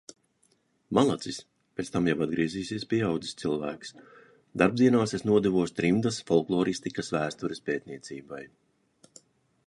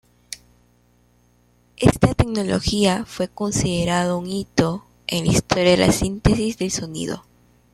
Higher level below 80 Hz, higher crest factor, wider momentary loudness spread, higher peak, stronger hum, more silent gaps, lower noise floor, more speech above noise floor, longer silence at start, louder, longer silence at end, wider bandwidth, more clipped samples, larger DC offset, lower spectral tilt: second, -60 dBFS vs -36 dBFS; about the same, 22 dB vs 20 dB; first, 17 LU vs 13 LU; second, -6 dBFS vs -2 dBFS; second, none vs 60 Hz at -40 dBFS; neither; first, -69 dBFS vs -58 dBFS; about the same, 42 dB vs 39 dB; first, 0.9 s vs 0.3 s; second, -28 LUFS vs -20 LUFS; first, 1.2 s vs 0.55 s; second, 11.5 kHz vs 14.5 kHz; neither; neither; about the same, -6 dB/octave vs -5 dB/octave